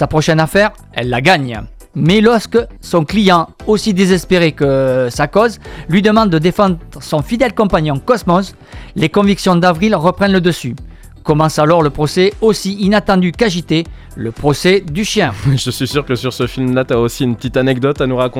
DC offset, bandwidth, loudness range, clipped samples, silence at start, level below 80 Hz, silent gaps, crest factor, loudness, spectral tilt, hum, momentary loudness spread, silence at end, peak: under 0.1%; 16 kHz; 2 LU; 0.1%; 0 s; -34 dBFS; none; 14 dB; -13 LUFS; -6 dB/octave; none; 7 LU; 0 s; 0 dBFS